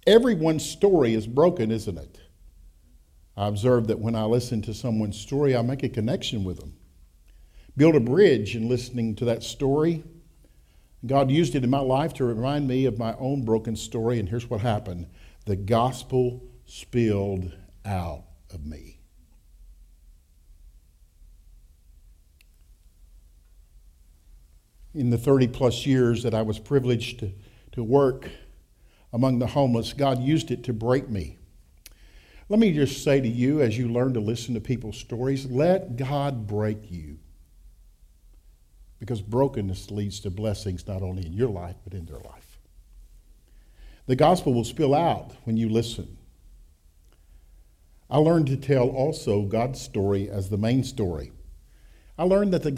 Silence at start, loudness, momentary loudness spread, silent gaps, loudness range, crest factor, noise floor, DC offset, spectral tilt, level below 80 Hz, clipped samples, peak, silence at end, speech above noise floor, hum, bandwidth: 0.05 s; -24 LUFS; 17 LU; none; 8 LU; 20 dB; -56 dBFS; under 0.1%; -7 dB/octave; -48 dBFS; under 0.1%; -4 dBFS; 0 s; 32 dB; none; 15 kHz